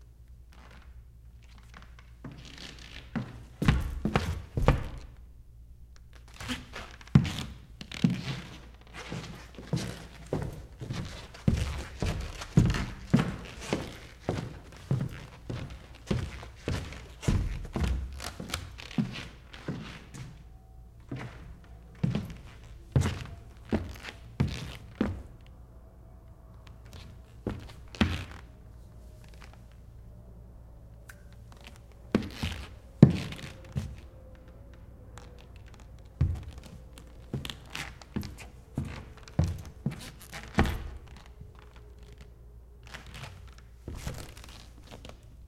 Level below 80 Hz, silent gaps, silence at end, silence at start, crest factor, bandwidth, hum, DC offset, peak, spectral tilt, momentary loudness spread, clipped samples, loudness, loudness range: -42 dBFS; none; 0 s; 0 s; 32 dB; 15.5 kHz; none; under 0.1%; -2 dBFS; -6.5 dB/octave; 23 LU; under 0.1%; -33 LUFS; 11 LU